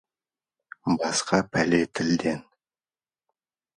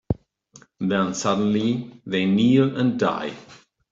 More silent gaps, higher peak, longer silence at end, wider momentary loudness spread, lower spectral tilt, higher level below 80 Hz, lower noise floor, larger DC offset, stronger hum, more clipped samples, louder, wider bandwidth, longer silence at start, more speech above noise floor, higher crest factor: neither; about the same, -6 dBFS vs -6 dBFS; first, 1.35 s vs 0.4 s; second, 8 LU vs 12 LU; second, -4.5 dB/octave vs -6 dB/octave; second, -58 dBFS vs -52 dBFS; first, under -90 dBFS vs -53 dBFS; neither; neither; neither; second, -25 LUFS vs -22 LUFS; first, 11.5 kHz vs 7.8 kHz; first, 0.85 s vs 0.1 s; first, over 66 dB vs 32 dB; first, 22 dB vs 16 dB